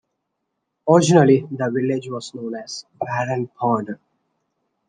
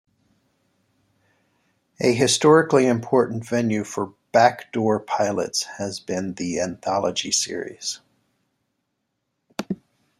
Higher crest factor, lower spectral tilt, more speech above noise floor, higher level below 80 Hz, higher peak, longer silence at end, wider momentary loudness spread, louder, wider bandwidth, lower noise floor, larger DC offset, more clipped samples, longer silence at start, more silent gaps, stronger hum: about the same, 18 dB vs 20 dB; first, -6 dB/octave vs -4 dB/octave; about the same, 57 dB vs 55 dB; about the same, -64 dBFS vs -66 dBFS; about the same, -2 dBFS vs -2 dBFS; first, 0.95 s vs 0.45 s; first, 17 LU vs 14 LU; first, -19 LUFS vs -22 LUFS; second, 10 kHz vs 15 kHz; about the same, -77 dBFS vs -76 dBFS; neither; neither; second, 0.85 s vs 2 s; neither; neither